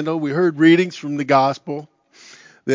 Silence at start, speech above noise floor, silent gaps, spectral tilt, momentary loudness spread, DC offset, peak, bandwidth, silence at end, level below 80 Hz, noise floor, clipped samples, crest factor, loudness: 0 s; 29 dB; none; -6.5 dB/octave; 17 LU; under 0.1%; -2 dBFS; 7.6 kHz; 0 s; -74 dBFS; -47 dBFS; under 0.1%; 18 dB; -17 LUFS